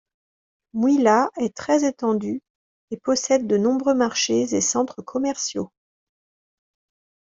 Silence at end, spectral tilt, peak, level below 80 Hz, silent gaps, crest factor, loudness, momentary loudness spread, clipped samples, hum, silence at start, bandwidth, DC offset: 1.55 s; -3.5 dB/octave; -4 dBFS; -66 dBFS; 2.50-2.88 s; 18 dB; -21 LUFS; 12 LU; under 0.1%; none; 0.75 s; 7.8 kHz; under 0.1%